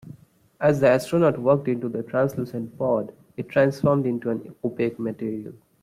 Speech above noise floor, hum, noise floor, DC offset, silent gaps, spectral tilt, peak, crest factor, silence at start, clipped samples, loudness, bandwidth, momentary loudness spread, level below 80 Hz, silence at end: 25 dB; none; -48 dBFS; under 0.1%; none; -7.5 dB/octave; -6 dBFS; 18 dB; 0.05 s; under 0.1%; -23 LUFS; 15.5 kHz; 12 LU; -62 dBFS; 0.25 s